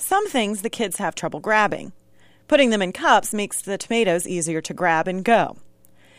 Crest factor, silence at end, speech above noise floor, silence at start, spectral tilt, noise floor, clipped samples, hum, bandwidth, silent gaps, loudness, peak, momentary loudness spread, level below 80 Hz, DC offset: 18 dB; 0.5 s; 34 dB; 0 s; -3.5 dB/octave; -54 dBFS; under 0.1%; none; 15.5 kHz; none; -21 LUFS; -4 dBFS; 9 LU; -58 dBFS; under 0.1%